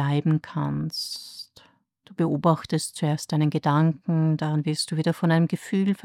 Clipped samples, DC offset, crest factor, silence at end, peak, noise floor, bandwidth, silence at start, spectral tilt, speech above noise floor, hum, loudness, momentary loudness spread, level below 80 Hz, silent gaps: under 0.1%; under 0.1%; 18 dB; 0.1 s; -8 dBFS; -57 dBFS; 14.5 kHz; 0 s; -6.5 dB/octave; 34 dB; none; -24 LUFS; 10 LU; -64 dBFS; none